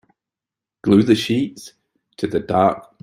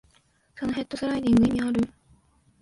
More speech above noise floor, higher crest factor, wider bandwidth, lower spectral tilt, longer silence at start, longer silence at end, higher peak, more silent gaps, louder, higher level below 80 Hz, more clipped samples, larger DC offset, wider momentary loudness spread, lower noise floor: first, 71 dB vs 40 dB; about the same, 18 dB vs 14 dB; first, 15.5 kHz vs 11.5 kHz; about the same, -6.5 dB/octave vs -6.5 dB/octave; first, 0.85 s vs 0.55 s; second, 0.2 s vs 0.75 s; first, -2 dBFS vs -12 dBFS; neither; first, -18 LUFS vs -25 LUFS; second, -56 dBFS vs -50 dBFS; neither; neither; about the same, 13 LU vs 11 LU; first, -88 dBFS vs -64 dBFS